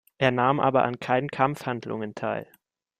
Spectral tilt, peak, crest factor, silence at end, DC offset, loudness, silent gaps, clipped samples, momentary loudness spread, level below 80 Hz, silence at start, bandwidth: -7 dB/octave; -6 dBFS; 20 dB; 0.55 s; under 0.1%; -26 LUFS; none; under 0.1%; 10 LU; -64 dBFS; 0.2 s; 15 kHz